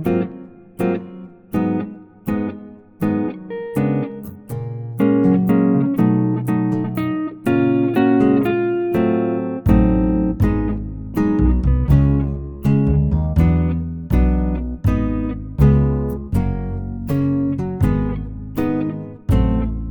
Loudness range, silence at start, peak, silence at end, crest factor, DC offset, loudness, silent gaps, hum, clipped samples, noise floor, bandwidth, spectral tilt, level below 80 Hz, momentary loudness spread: 6 LU; 0 s; -2 dBFS; 0 s; 14 dB; under 0.1%; -19 LUFS; none; none; under 0.1%; -38 dBFS; 19.5 kHz; -10 dB/octave; -26 dBFS; 12 LU